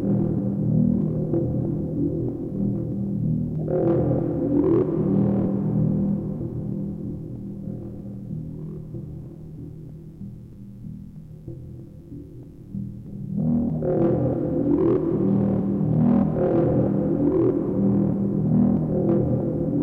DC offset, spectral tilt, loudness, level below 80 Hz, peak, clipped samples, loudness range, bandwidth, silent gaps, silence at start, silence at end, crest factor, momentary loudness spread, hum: under 0.1%; -12.5 dB/octave; -23 LUFS; -44 dBFS; -8 dBFS; under 0.1%; 17 LU; 3.1 kHz; none; 0 s; 0 s; 14 dB; 19 LU; none